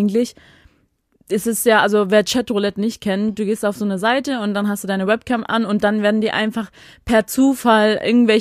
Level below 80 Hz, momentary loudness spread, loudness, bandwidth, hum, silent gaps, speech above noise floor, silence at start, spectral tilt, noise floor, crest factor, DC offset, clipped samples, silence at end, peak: -52 dBFS; 8 LU; -18 LUFS; 15.5 kHz; none; none; 44 dB; 0 s; -4.5 dB/octave; -61 dBFS; 16 dB; under 0.1%; under 0.1%; 0 s; 0 dBFS